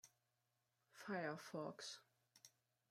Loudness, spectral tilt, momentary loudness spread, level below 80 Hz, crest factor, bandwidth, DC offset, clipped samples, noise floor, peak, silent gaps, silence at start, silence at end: -51 LUFS; -4 dB/octave; 21 LU; under -90 dBFS; 20 dB; 16 kHz; under 0.1%; under 0.1%; -88 dBFS; -34 dBFS; none; 0.05 s; 0.45 s